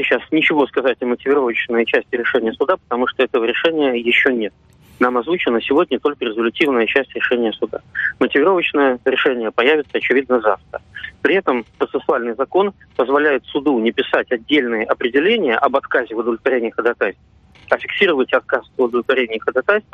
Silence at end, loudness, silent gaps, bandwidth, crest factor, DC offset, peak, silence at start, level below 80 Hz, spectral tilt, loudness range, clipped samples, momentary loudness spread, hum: 0.1 s; -17 LUFS; none; 6.6 kHz; 18 dB; under 0.1%; 0 dBFS; 0 s; -56 dBFS; -6 dB/octave; 2 LU; under 0.1%; 6 LU; none